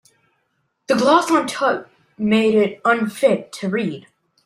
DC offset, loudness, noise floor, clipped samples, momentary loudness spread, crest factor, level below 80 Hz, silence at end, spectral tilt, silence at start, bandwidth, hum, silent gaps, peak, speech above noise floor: under 0.1%; -18 LUFS; -70 dBFS; under 0.1%; 10 LU; 18 dB; -62 dBFS; 0.45 s; -5 dB/octave; 0.9 s; 15.5 kHz; none; none; -2 dBFS; 52 dB